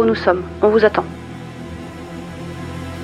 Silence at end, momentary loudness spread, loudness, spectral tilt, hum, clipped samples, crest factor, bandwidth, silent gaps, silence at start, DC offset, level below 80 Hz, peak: 0 s; 18 LU; -17 LUFS; -7 dB/octave; none; under 0.1%; 20 dB; 12 kHz; none; 0 s; under 0.1%; -46 dBFS; 0 dBFS